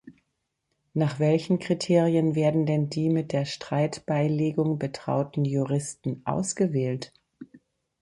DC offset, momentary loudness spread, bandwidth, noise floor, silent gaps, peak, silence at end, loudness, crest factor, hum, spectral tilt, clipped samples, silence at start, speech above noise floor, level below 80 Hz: under 0.1%; 7 LU; 11.5 kHz; -79 dBFS; none; -8 dBFS; 0.45 s; -26 LUFS; 18 dB; none; -6.5 dB/octave; under 0.1%; 0.05 s; 54 dB; -64 dBFS